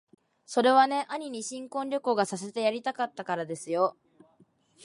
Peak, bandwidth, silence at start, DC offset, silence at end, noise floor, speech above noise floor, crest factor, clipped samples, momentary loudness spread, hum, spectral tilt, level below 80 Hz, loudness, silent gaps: -8 dBFS; 11.5 kHz; 0.5 s; under 0.1%; 0.95 s; -64 dBFS; 36 dB; 20 dB; under 0.1%; 12 LU; none; -4 dB/octave; -82 dBFS; -28 LUFS; none